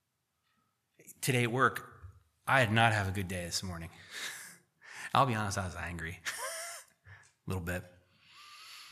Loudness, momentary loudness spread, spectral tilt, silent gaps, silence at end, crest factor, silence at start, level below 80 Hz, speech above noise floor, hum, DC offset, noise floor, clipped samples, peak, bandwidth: -33 LUFS; 21 LU; -4 dB/octave; none; 0 s; 26 dB; 1.05 s; -62 dBFS; 49 dB; none; under 0.1%; -81 dBFS; under 0.1%; -10 dBFS; 15 kHz